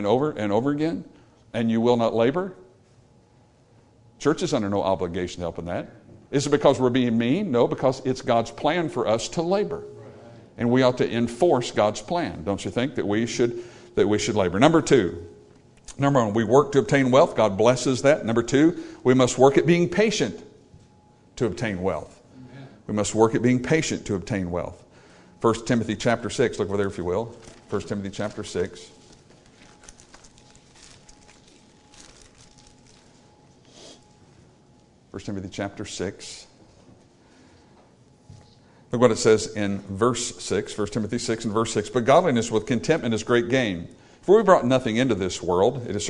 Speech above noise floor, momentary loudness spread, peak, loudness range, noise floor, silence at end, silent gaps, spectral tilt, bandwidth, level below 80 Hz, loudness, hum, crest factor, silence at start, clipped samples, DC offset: 35 dB; 13 LU; -2 dBFS; 16 LU; -57 dBFS; 0 s; none; -5.5 dB/octave; 11 kHz; -54 dBFS; -23 LUFS; none; 22 dB; 0 s; under 0.1%; under 0.1%